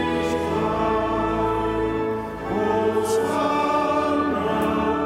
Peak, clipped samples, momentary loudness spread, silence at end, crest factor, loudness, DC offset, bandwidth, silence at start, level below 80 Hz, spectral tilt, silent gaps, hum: -10 dBFS; under 0.1%; 4 LU; 0 s; 12 dB; -22 LUFS; under 0.1%; 16 kHz; 0 s; -42 dBFS; -6 dB/octave; none; none